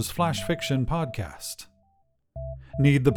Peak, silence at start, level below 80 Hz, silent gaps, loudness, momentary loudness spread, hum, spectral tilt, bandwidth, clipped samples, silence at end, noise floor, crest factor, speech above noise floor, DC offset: -6 dBFS; 0 s; -42 dBFS; none; -27 LUFS; 17 LU; none; -6 dB/octave; 18 kHz; under 0.1%; 0 s; -67 dBFS; 20 dB; 42 dB; under 0.1%